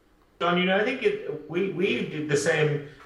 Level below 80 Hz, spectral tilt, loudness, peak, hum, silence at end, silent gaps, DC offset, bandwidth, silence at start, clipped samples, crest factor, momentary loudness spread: -64 dBFS; -5 dB/octave; -26 LUFS; -10 dBFS; none; 0 s; none; under 0.1%; 12 kHz; 0.4 s; under 0.1%; 16 dB; 7 LU